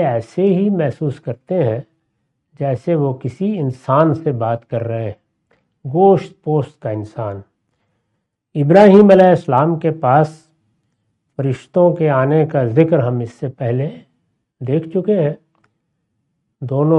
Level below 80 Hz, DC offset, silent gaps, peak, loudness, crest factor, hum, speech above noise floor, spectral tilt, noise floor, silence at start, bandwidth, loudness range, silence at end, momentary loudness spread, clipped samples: -58 dBFS; under 0.1%; none; 0 dBFS; -16 LUFS; 16 dB; none; 57 dB; -9.5 dB/octave; -72 dBFS; 0 s; 9.2 kHz; 7 LU; 0 s; 15 LU; under 0.1%